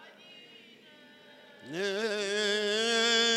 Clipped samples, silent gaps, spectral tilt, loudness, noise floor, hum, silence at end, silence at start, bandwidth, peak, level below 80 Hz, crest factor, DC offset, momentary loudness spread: under 0.1%; none; -1.5 dB/octave; -28 LUFS; -56 dBFS; none; 0 s; 0 s; 13.5 kHz; -14 dBFS; under -90 dBFS; 18 dB; under 0.1%; 26 LU